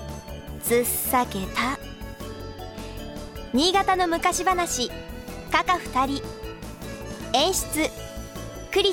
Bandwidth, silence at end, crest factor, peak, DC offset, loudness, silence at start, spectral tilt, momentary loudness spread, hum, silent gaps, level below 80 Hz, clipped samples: 19 kHz; 0 s; 20 dB; -6 dBFS; under 0.1%; -24 LUFS; 0 s; -3 dB/octave; 16 LU; none; none; -42 dBFS; under 0.1%